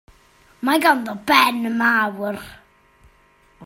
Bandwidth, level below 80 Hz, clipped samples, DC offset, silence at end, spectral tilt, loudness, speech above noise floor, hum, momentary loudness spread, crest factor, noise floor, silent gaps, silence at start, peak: 16.5 kHz; -58 dBFS; under 0.1%; under 0.1%; 0 s; -3 dB/octave; -18 LUFS; 37 dB; none; 13 LU; 20 dB; -56 dBFS; none; 0.6 s; 0 dBFS